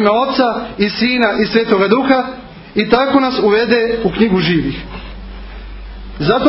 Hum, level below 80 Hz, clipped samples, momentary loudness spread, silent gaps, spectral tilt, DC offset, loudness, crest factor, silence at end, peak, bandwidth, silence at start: none; -34 dBFS; under 0.1%; 20 LU; none; -8.5 dB/octave; under 0.1%; -14 LUFS; 14 dB; 0 s; 0 dBFS; 5.8 kHz; 0 s